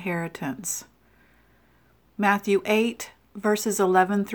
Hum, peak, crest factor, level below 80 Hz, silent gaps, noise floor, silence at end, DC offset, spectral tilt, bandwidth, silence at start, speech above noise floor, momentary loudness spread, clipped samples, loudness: none; -6 dBFS; 20 dB; -64 dBFS; none; -61 dBFS; 0 s; under 0.1%; -4.5 dB/octave; over 20 kHz; 0 s; 37 dB; 12 LU; under 0.1%; -24 LUFS